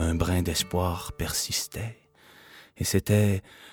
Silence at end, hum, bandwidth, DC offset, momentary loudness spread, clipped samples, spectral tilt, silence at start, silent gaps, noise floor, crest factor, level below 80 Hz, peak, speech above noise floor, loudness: 0 s; none; 19 kHz; under 0.1%; 10 LU; under 0.1%; -4.5 dB/octave; 0 s; none; -54 dBFS; 20 dB; -42 dBFS; -8 dBFS; 27 dB; -27 LUFS